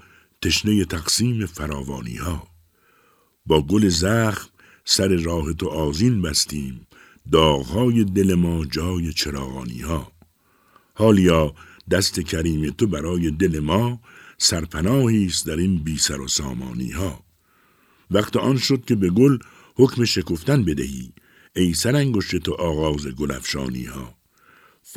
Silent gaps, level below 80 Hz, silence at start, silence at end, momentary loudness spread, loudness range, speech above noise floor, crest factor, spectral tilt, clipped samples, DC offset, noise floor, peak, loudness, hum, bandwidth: none; -38 dBFS; 0.4 s; 0 s; 12 LU; 3 LU; 40 dB; 20 dB; -5 dB/octave; under 0.1%; under 0.1%; -60 dBFS; 0 dBFS; -21 LUFS; none; 16.5 kHz